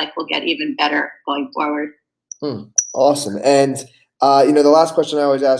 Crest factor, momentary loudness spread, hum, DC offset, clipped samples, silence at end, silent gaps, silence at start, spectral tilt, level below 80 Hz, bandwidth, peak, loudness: 16 dB; 14 LU; none; under 0.1%; under 0.1%; 0 s; none; 0 s; -3 dB/octave; -70 dBFS; 11 kHz; 0 dBFS; -16 LUFS